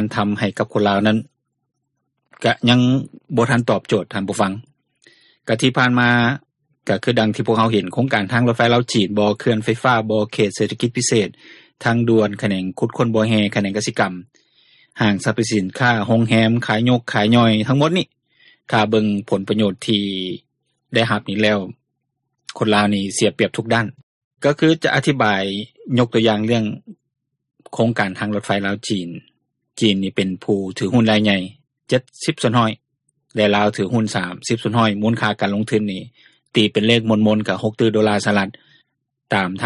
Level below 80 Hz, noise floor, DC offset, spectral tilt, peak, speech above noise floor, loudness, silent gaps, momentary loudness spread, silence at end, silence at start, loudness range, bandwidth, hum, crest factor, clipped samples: -56 dBFS; -75 dBFS; under 0.1%; -5.5 dB/octave; -2 dBFS; 57 dB; -18 LUFS; 24.03-24.31 s; 8 LU; 0 s; 0 s; 3 LU; 11.5 kHz; none; 18 dB; under 0.1%